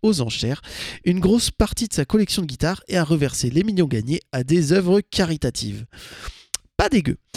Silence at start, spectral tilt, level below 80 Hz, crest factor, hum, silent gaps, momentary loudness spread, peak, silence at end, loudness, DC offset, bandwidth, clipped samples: 0.05 s; -5 dB/octave; -38 dBFS; 20 dB; none; none; 13 LU; 0 dBFS; 0.2 s; -21 LUFS; under 0.1%; 15.5 kHz; under 0.1%